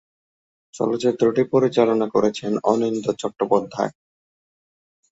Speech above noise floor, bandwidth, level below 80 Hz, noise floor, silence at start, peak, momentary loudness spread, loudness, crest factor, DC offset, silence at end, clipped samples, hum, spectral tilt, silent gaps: over 70 dB; 8 kHz; -64 dBFS; under -90 dBFS; 0.75 s; -2 dBFS; 8 LU; -21 LUFS; 20 dB; under 0.1%; 1.25 s; under 0.1%; none; -6 dB/octave; none